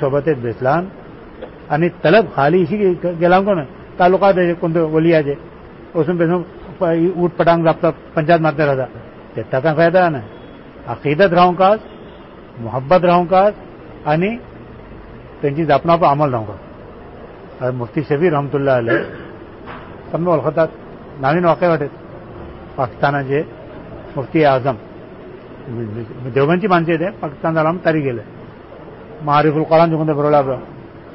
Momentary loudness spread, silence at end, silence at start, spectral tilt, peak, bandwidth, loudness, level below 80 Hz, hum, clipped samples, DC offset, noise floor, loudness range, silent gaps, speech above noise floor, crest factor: 23 LU; 0 s; 0 s; -12 dB/octave; -2 dBFS; 5.8 kHz; -16 LUFS; -46 dBFS; none; under 0.1%; under 0.1%; -37 dBFS; 4 LU; none; 22 dB; 14 dB